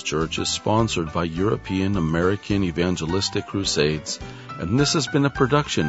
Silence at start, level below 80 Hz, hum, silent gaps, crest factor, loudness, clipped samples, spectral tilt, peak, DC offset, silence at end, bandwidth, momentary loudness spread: 0 s; -42 dBFS; none; none; 18 dB; -22 LUFS; under 0.1%; -4.5 dB/octave; -4 dBFS; under 0.1%; 0 s; 8 kHz; 5 LU